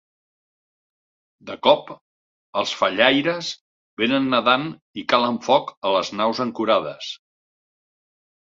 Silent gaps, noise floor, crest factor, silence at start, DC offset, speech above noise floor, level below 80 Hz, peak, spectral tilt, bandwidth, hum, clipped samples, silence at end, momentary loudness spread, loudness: 2.01-2.53 s, 3.61-3.97 s, 4.82-4.94 s, 5.77-5.82 s; under -90 dBFS; 22 dB; 1.45 s; under 0.1%; over 69 dB; -66 dBFS; -2 dBFS; -4 dB/octave; 7.8 kHz; none; under 0.1%; 1.3 s; 15 LU; -21 LUFS